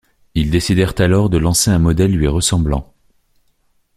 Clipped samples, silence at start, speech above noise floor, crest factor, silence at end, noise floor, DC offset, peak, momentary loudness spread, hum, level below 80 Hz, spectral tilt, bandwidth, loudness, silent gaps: under 0.1%; 0.35 s; 46 dB; 16 dB; 1.15 s; -60 dBFS; under 0.1%; 0 dBFS; 7 LU; none; -28 dBFS; -5 dB/octave; 15 kHz; -15 LUFS; none